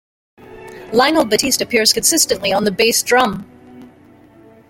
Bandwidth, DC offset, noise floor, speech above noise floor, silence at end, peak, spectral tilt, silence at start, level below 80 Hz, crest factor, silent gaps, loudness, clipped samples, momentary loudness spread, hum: 17 kHz; under 0.1%; -46 dBFS; 31 dB; 0.85 s; 0 dBFS; -2 dB/octave; 0.5 s; -50 dBFS; 18 dB; none; -14 LUFS; under 0.1%; 9 LU; none